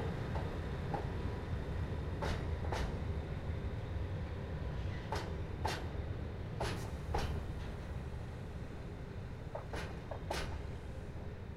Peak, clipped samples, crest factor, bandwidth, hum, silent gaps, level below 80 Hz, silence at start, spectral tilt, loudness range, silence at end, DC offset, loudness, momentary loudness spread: -22 dBFS; under 0.1%; 18 dB; 14 kHz; none; none; -44 dBFS; 0 s; -6.5 dB/octave; 4 LU; 0 s; under 0.1%; -42 LUFS; 7 LU